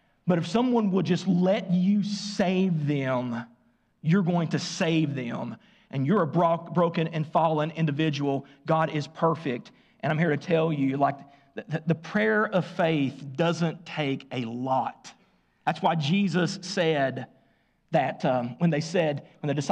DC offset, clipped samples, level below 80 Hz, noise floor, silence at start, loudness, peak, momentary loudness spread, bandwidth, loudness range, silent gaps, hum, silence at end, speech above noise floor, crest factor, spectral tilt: under 0.1%; under 0.1%; -70 dBFS; -66 dBFS; 0.25 s; -26 LUFS; -12 dBFS; 9 LU; 9 kHz; 3 LU; none; none; 0 s; 41 dB; 14 dB; -6.5 dB/octave